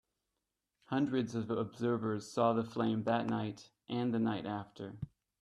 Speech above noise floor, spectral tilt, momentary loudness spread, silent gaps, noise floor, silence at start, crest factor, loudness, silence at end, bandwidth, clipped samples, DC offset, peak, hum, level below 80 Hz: 53 dB; -7 dB/octave; 13 LU; none; -88 dBFS; 0.9 s; 20 dB; -36 LUFS; 0.35 s; 11.5 kHz; under 0.1%; under 0.1%; -16 dBFS; none; -70 dBFS